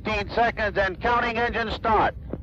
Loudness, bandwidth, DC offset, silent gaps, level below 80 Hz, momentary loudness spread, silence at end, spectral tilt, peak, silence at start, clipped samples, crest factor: -24 LUFS; 7.8 kHz; under 0.1%; none; -38 dBFS; 4 LU; 0 s; -6 dB/octave; -10 dBFS; 0 s; under 0.1%; 14 dB